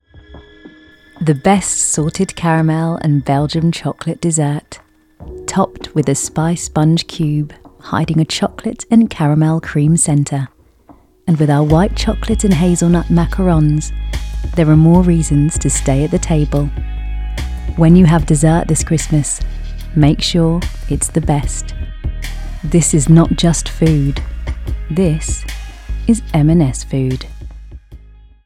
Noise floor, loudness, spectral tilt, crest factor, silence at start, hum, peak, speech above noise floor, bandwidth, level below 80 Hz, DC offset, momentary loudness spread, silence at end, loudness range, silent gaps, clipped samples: -46 dBFS; -14 LUFS; -5.5 dB/octave; 14 dB; 0.15 s; none; 0 dBFS; 33 dB; 14 kHz; -24 dBFS; under 0.1%; 13 LU; 0.5 s; 4 LU; none; under 0.1%